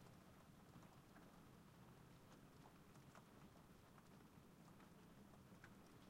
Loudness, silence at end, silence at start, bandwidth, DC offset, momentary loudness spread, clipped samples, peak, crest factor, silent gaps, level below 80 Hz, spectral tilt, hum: -67 LUFS; 0 s; 0 s; 16 kHz; under 0.1%; 2 LU; under 0.1%; -48 dBFS; 18 dB; none; -78 dBFS; -5.5 dB/octave; none